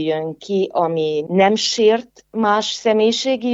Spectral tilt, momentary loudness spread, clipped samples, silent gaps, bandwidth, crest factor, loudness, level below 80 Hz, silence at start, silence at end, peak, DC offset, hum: -4 dB/octave; 7 LU; under 0.1%; none; 8 kHz; 16 dB; -18 LUFS; -66 dBFS; 0 s; 0 s; -2 dBFS; under 0.1%; none